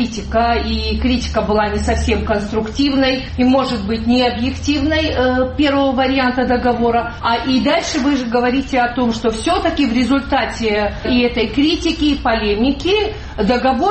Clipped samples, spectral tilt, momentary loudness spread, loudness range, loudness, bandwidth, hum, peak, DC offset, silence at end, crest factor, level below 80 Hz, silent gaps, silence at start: under 0.1%; -5.5 dB/octave; 3 LU; 1 LU; -16 LUFS; 8.8 kHz; none; -4 dBFS; under 0.1%; 0 s; 12 dB; -28 dBFS; none; 0 s